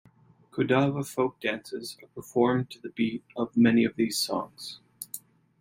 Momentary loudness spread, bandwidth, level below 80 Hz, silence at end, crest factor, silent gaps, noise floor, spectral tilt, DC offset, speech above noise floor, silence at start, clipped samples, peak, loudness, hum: 17 LU; 16.5 kHz; -66 dBFS; 0.45 s; 18 dB; none; -58 dBFS; -5 dB/octave; under 0.1%; 31 dB; 0.55 s; under 0.1%; -10 dBFS; -27 LUFS; none